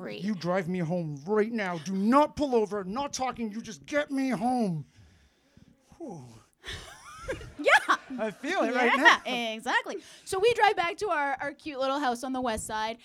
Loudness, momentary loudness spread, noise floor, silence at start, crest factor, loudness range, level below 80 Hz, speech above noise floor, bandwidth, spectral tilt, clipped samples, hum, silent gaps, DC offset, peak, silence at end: -27 LUFS; 18 LU; -62 dBFS; 0 s; 24 dB; 8 LU; -58 dBFS; 34 dB; 16 kHz; -4.5 dB/octave; under 0.1%; none; none; under 0.1%; -4 dBFS; 0.1 s